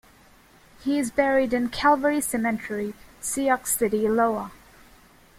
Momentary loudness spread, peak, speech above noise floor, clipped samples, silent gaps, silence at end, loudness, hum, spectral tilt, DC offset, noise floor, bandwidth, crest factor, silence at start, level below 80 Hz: 11 LU; -8 dBFS; 31 dB; under 0.1%; none; 0.85 s; -24 LUFS; none; -3.5 dB/octave; under 0.1%; -54 dBFS; 16.5 kHz; 18 dB; 0.8 s; -54 dBFS